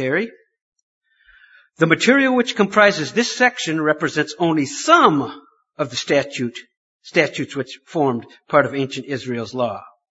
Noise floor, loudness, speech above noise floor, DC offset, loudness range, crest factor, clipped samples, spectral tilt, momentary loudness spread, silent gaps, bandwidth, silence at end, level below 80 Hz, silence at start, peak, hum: -53 dBFS; -18 LUFS; 34 dB; under 0.1%; 5 LU; 20 dB; under 0.1%; -4.5 dB/octave; 13 LU; 0.61-0.72 s, 0.82-1.01 s, 6.77-7.00 s; 8 kHz; 0.25 s; -64 dBFS; 0 s; 0 dBFS; none